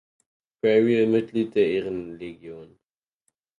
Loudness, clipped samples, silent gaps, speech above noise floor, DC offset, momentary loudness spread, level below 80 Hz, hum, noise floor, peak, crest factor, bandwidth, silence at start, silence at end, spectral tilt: -23 LUFS; under 0.1%; none; 53 dB; under 0.1%; 19 LU; -64 dBFS; none; -76 dBFS; -8 dBFS; 18 dB; 9 kHz; 0.65 s; 0.95 s; -8 dB/octave